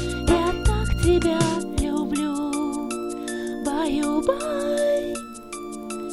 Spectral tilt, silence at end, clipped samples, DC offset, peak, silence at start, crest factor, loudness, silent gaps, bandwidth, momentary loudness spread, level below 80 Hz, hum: -5.5 dB/octave; 0 s; under 0.1%; under 0.1%; -6 dBFS; 0 s; 18 dB; -24 LUFS; none; 15 kHz; 12 LU; -32 dBFS; 50 Hz at -55 dBFS